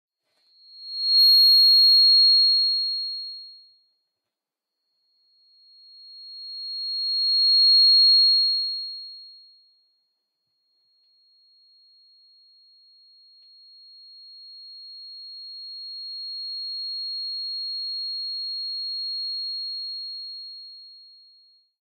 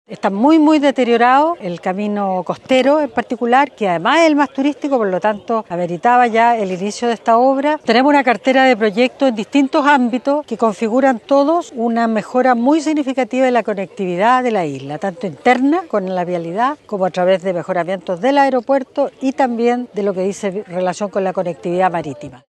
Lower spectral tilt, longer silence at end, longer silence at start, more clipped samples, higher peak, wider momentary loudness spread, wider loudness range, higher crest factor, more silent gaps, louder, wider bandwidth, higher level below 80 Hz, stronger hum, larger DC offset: second, 6 dB/octave vs -5.5 dB/octave; first, 0.95 s vs 0.15 s; first, 0.75 s vs 0.1 s; neither; second, -12 dBFS vs 0 dBFS; first, 26 LU vs 9 LU; first, 22 LU vs 4 LU; about the same, 14 dB vs 14 dB; neither; about the same, -17 LUFS vs -15 LUFS; first, 14 kHz vs 9.4 kHz; second, under -90 dBFS vs -64 dBFS; neither; neither